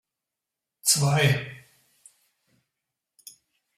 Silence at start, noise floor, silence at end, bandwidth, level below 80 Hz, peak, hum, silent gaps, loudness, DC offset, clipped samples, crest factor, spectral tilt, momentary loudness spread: 0.85 s; -87 dBFS; 2.2 s; 16 kHz; -62 dBFS; -6 dBFS; none; none; -22 LUFS; under 0.1%; under 0.1%; 22 dB; -3.5 dB/octave; 10 LU